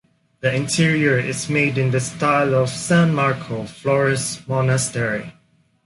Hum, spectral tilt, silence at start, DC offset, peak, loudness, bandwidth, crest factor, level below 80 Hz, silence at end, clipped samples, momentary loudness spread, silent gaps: none; -5 dB/octave; 0.45 s; under 0.1%; -4 dBFS; -19 LUFS; 11.5 kHz; 14 dB; -54 dBFS; 0.55 s; under 0.1%; 8 LU; none